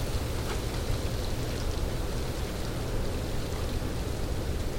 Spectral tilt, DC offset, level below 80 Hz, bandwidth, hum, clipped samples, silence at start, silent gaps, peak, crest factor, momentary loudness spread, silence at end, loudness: -5 dB/octave; 0.2%; -34 dBFS; 17 kHz; none; under 0.1%; 0 s; none; -16 dBFS; 14 dB; 1 LU; 0 s; -33 LUFS